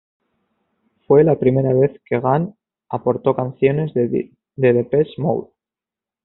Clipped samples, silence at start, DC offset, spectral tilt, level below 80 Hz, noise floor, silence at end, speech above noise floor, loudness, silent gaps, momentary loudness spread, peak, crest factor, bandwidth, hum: under 0.1%; 1.1 s; under 0.1%; -8.5 dB/octave; -56 dBFS; -89 dBFS; 0.8 s; 72 dB; -18 LUFS; none; 10 LU; -2 dBFS; 18 dB; 4.1 kHz; none